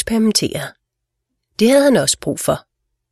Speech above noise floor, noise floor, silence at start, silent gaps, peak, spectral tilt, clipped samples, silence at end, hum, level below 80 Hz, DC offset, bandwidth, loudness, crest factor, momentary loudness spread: 61 dB; -77 dBFS; 0 s; none; 0 dBFS; -4 dB/octave; under 0.1%; 0.55 s; none; -48 dBFS; under 0.1%; 14.5 kHz; -16 LUFS; 16 dB; 15 LU